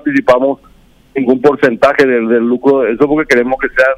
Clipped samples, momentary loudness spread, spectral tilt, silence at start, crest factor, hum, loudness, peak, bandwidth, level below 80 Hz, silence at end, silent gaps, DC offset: under 0.1%; 6 LU; -6 dB/octave; 0.05 s; 10 dB; none; -11 LUFS; 0 dBFS; 12 kHz; -42 dBFS; 0 s; none; under 0.1%